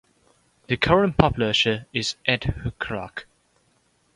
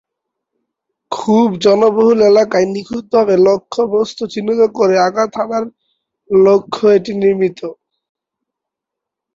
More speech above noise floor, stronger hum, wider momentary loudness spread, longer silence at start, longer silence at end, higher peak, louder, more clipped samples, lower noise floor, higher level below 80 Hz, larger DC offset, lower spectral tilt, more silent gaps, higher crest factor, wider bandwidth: second, 42 dB vs 70 dB; neither; about the same, 12 LU vs 11 LU; second, 0.7 s vs 1.1 s; second, 0.95 s vs 1.65 s; about the same, 0 dBFS vs -2 dBFS; second, -22 LUFS vs -13 LUFS; neither; second, -65 dBFS vs -82 dBFS; first, -42 dBFS vs -56 dBFS; neither; about the same, -5 dB/octave vs -6 dB/octave; neither; first, 24 dB vs 12 dB; first, 11 kHz vs 7.6 kHz